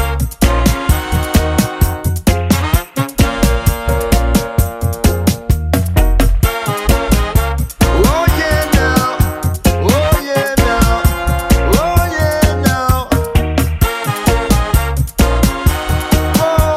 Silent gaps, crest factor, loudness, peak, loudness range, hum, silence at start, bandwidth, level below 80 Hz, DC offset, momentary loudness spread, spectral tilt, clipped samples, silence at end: none; 12 dB; -14 LUFS; 0 dBFS; 2 LU; none; 0 s; 16.5 kHz; -16 dBFS; under 0.1%; 4 LU; -5.5 dB/octave; under 0.1%; 0 s